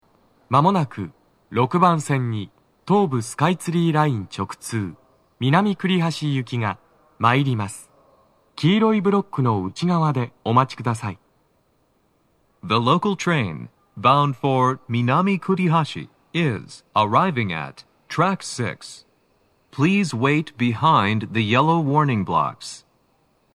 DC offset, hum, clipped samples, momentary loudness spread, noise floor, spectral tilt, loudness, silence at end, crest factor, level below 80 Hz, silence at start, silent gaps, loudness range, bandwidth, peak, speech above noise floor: under 0.1%; none; under 0.1%; 14 LU; -64 dBFS; -6.5 dB/octave; -21 LUFS; 0.75 s; 20 dB; -64 dBFS; 0.5 s; none; 4 LU; 13 kHz; -2 dBFS; 44 dB